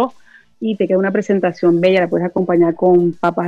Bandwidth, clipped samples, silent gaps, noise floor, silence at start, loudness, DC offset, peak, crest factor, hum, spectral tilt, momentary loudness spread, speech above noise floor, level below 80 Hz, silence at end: 7.4 kHz; under 0.1%; none; -45 dBFS; 0 s; -15 LUFS; under 0.1%; -4 dBFS; 12 dB; none; -8 dB/octave; 7 LU; 31 dB; -60 dBFS; 0 s